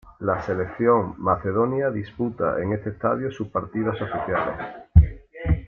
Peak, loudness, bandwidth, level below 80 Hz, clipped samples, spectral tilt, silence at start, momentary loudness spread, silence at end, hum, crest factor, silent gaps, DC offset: -2 dBFS; -24 LUFS; 5.6 kHz; -32 dBFS; under 0.1%; -10 dB/octave; 0.05 s; 9 LU; 0 s; none; 20 dB; none; under 0.1%